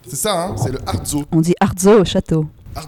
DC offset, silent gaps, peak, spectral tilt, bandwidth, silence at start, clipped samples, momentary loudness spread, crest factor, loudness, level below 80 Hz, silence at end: under 0.1%; none; -2 dBFS; -5.5 dB/octave; 17.5 kHz; 0.05 s; under 0.1%; 10 LU; 14 dB; -16 LUFS; -36 dBFS; 0 s